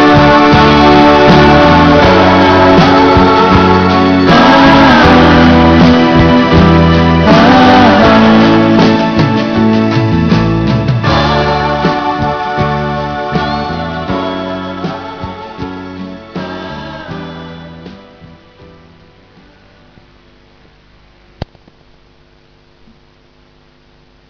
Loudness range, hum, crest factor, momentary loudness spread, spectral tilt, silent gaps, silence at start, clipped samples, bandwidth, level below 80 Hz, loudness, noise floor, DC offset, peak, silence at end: 19 LU; none; 8 dB; 19 LU; -7 dB/octave; none; 0 s; 0.3%; 5.4 kHz; -26 dBFS; -7 LUFS; -46 dBFS; under 0.1%; 0 dBFS; 2.85 s